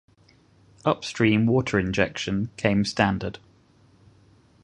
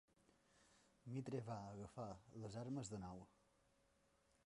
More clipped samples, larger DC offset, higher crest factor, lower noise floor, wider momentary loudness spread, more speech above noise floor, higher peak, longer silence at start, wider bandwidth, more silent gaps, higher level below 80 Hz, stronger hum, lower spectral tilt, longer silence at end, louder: neither; neither; first, 24 dB vs 18 dB; second, -58 dBFS vs -80 dBFS; second, 7 LU vs 10 LU; first, 35 dB vs 29 dB; first, -2 dBFS vs -36 dBFS; first, 0.85 s vs 0.55 s; about the same, 11 kHz vs 11 kHz; neither; first, -50 dBFS vs -76 dBFS; neither; about the same, -6 dB/octave vs -6.5 dB/octave; about the same, 1.25 s vs 1.15 s; first, -24 LUFS vs -52 LUFS